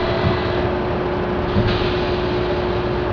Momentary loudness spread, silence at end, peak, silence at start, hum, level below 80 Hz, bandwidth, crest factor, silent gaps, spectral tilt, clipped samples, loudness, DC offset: 3 LU; 0 s; -6 dBFS; 0 s; none; -30 dBFS; 5.4 kHz; 14 dB; none; -8 dB/octave; under 0.1%; -20 LUFS; under 0.1%